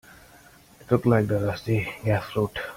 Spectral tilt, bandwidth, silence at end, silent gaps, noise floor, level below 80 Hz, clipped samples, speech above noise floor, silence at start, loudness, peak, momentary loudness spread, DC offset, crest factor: -7.5 dB/octave; 16 kHz; 0 s; none; -52 dBFS; -52 dBFS; under 0.1%; 28 dB; 0.9 s; -25 LUFS; -8 dBFS; 6 LU; under 0.1%; 18 dB